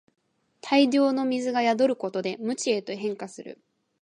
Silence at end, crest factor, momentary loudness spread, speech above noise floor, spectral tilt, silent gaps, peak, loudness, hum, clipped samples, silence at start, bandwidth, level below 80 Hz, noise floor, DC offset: 0.5 s; 18 dB; 17 LU; 23 dB; -4 dB/octave; none; -8 dBFS; -25 LUFS; none; under 0.1%; 0.65 s; 10 kHz; -82 dBFS; -48 dBFS; under 0.1%